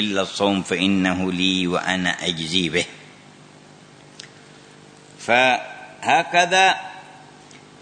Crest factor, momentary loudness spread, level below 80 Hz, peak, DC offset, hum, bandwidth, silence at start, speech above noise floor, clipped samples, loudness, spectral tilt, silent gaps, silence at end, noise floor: 20 dB; 21 LU; -60 dBFS; -2 dBFS; under 0.1%; 50 Hz at -55 dBFS; 9.6 kHz; 0 s; 27 dB; under 0.1%; -19 LUFS; -3.5 dB/octave; none; 0.25 s; -46 dBFS